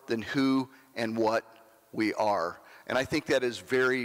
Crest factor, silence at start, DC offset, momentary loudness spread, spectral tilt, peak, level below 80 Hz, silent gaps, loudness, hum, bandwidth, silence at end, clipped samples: 12 dB; 0.1 s; under 0.1%; 9 LU; -5 dB/octave; -18 dBFS; -66 dBFS; none; -29 LUFS; none; 16 kHz; 0 s; under 0.1%